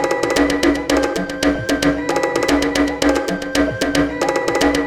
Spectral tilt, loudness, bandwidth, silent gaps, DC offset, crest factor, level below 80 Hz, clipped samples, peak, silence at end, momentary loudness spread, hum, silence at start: -4 dB/octave; -17 LUFS; 16 kHz; none; under 0.1%; 16 dB; -36 dBFS; under 0.1%; -2 dBFS; 0 s; 3 LU; none; 0 s